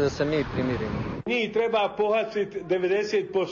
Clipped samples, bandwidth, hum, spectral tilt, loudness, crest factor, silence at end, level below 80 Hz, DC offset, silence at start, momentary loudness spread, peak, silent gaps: under 0.1%; 7.4 kHz; none; -6 dB/octave; -26 LUFS; 14 dB; 0 s; -48 dBFS; under 0.1%; 0 s; 5 LU; -12 dBFS; none